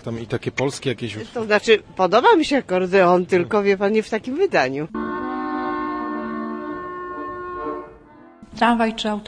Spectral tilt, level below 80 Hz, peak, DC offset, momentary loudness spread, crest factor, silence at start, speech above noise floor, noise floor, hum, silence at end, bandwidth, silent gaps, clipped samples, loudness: -5.5 dB/octave; -52 dBFS; -2 dBFS; under 0.1%; 14 LU; 20 dB; 0.05 s; 27 dB; -46 dBFS; none; 0 s; 10.5 kHz; none; under 0.1%; -21 LUFS